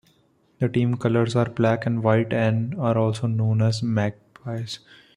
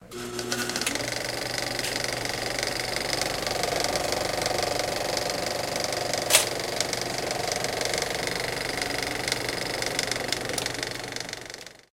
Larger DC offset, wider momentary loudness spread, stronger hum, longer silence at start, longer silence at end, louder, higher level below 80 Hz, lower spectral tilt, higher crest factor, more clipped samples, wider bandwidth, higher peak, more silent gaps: neither; first, 11 LU vs 4 LU; neither; first, 0.6 s vs 0 s; first, 0.4 s vs 0.15 s; first, -23 LUFS vs -27 LUFS; second, -58 dBFS vs -52 dBFS; first, -7.5 dB/octave vs -2 dB/octave; second, 18 dB vs 28 dB; neither; second, 10.5 kHz vs 17 kHz; second, -6 dBFS vs 0 dBFS; neither